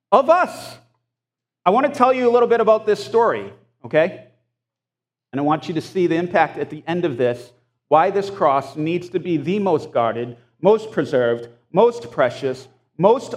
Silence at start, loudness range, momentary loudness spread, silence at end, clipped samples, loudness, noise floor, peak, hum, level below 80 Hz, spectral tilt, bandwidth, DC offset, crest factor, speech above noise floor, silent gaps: 0.1 s; 4 LU; 11 LU; 0 s; under 0.1%; -19 LUFS; -87 dBFS; 0 dBFS; none; -70 dBFS; -6.5 dB/octave; 12.5 kHz; under 0.1%; 18 dB; 69 dB; none